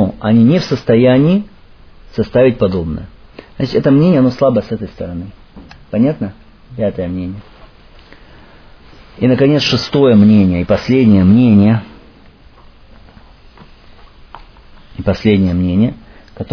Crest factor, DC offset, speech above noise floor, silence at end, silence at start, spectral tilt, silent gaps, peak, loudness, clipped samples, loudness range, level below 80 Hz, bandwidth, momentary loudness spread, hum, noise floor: 14 dB; under 0.1%; 30 dB; 0 s; 0 s; -8 dB/octave; none; 0 dBFS; -12 LUFS; under 0.1%; 11 LU; -38 dBFS; 5.4 kHz; 17 LU; none; -41 dBFS